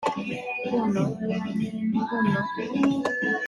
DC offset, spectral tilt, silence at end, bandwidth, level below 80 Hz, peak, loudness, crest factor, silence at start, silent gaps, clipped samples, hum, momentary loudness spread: under 0.1%; -7 dB/octave; 0 s; 11 kHz; -62 dBFS; -10 dBFS; -26 LUFS; 16 dB; 0 s; none; under 0.1%; none; 5 LU